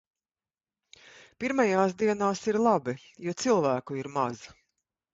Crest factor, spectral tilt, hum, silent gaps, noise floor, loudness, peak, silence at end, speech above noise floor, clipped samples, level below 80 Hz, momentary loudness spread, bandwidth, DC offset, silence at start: 18 dB; -5.5 dB/octave; none; none; under -90 dBFS; -28 LUFS; -10 dBFS; 0.6 s; over 63 dB; under 0.1%; -68 dBFS; 11 LU; 8 kHz; under 0.1%; 1.4 s